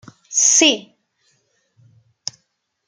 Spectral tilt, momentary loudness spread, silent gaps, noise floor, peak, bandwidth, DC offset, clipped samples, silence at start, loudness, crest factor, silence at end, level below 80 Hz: 0.5 dB/octave; 21 LU; none; -70 dBFS; -2 dBFS; 10.5 kHz; under 0.1%; under 0.1%; 0.3 s; -14 LUFS; 20 dB; 2.05 s; -72 dBFS